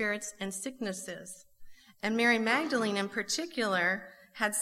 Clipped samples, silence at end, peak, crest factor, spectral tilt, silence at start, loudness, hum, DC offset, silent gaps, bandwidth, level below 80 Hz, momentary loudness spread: under 0.1%; 0 s; -12 dBFS; 20 dB; -3 dB/octave; 0 s; -31 LUFS; none; under 0.1%; none; 16 kHz; -70 dBFS; 16 LU